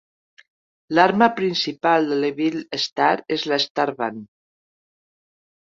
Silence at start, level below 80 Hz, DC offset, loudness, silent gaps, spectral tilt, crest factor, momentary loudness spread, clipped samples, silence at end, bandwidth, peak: 0.9 s; -68 dBFS; under 0.1%; -20 LUFS; 2.92-2.96 s, 3.70-3.75 s; -4.5 dB/octave; 20 dB; 8 LU; under 0.1%; 1.4 s; 7.6 kHz; -2 dBFS